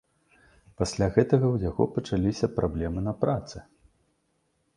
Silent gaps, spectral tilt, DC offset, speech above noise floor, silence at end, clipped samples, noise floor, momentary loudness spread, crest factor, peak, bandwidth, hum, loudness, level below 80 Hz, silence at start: none; -7 dB/octave; under 0.1%; 47 dB; 1.15 s; under 0.1%; -72 dBFS; 9 LU; 24 dB; -4 dBFS; 11 kHz; none; -27 LUFS; -44 dBFS; 0.8 s